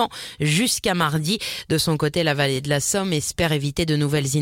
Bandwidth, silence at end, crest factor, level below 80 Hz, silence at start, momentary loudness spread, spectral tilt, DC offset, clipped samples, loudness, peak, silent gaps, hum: 16.5 kHz; 0 s; 16 dB; -46 dBFS; 0 s; 4 LU; -4 dB/octave; under 0.1%; under 0.1%; -21 LUFS; -6 dBFS; none; none